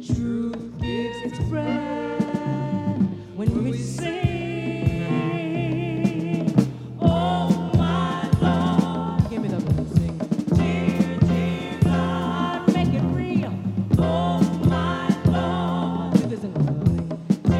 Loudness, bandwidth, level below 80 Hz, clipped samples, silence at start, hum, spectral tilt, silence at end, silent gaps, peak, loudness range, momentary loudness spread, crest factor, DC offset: -23 LUFS; 11.5 kHz; -40 dBFS; under 0.1%; 0 s; none; -7.5 dB/octave; 0 s; none; -2 dBFS; 4 LU; 6 LU; 20 dB; under 0.1%